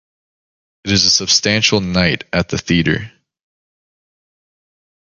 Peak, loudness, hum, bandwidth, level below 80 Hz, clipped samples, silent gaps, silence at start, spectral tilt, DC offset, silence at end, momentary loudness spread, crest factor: 0 dBFS; -14 LUFS; none; 10 kHz; -40 dBFS; under 0.1%; none; 0.85 s; -3 dB/octave; under 0.1%; 2 s; 8 LU; 18 dB